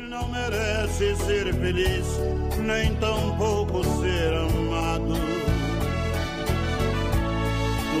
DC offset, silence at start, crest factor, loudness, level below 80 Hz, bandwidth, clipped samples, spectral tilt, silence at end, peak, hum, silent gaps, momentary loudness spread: under 0.1%; 0 s; 12 dB; -25 LUFS; -30 dBFS; 15.5 kHz; under 0.1%; -5.5 dB/octave; 0 s; -12 dBFS; none; none; 3 LU